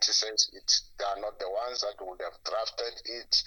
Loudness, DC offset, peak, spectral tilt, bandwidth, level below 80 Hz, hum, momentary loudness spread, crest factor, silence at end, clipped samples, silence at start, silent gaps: -30 LUFS; under 0.1%; -10 dBFS; 2 dB/octave; 18.5 kHz; -60 dBFS; none; 13 LU; 22 dB; 0 s; under 0.1%; 0 s; none